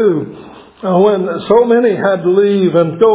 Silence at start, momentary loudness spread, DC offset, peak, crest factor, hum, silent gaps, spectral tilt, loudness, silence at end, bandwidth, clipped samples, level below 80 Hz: 0 s; 8 LU; under 0.1%; 0 dBFS; 12 dB; none; none; -11.5 dB/octave; -12 LUFS; 0 s; 4 kHz; under 0.1%; -54 dBFS